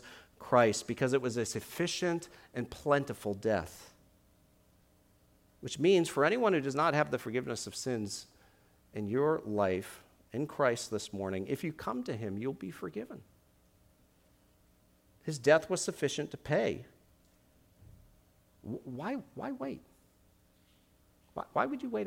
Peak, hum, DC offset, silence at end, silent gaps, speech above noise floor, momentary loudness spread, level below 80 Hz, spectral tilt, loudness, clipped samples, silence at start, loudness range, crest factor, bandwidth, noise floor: -12 dBFS; none; under 0.1%; 0 s; none; 34 dB; 17 LU; -66 dBFS; -5 dB/octave; -33 LUFS; under 0.1%; 0 s; 13 LU; 24 dB; 17 kHz; -67 dBFS